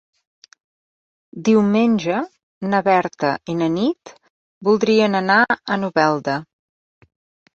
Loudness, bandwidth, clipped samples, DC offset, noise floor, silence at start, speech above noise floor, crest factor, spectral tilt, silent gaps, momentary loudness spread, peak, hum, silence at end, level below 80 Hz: -18 LUFS; 7.2 kHz; under 0.1%; under 0.1%; under -90 dBFS; 1.35 s; over 72 dB; 18 dB; -6 dB/octave; 2.43-2.61 s, 4.30-4.61 s; 9 LU; -2 dBFS; none; 1.1 s; -62 dBFS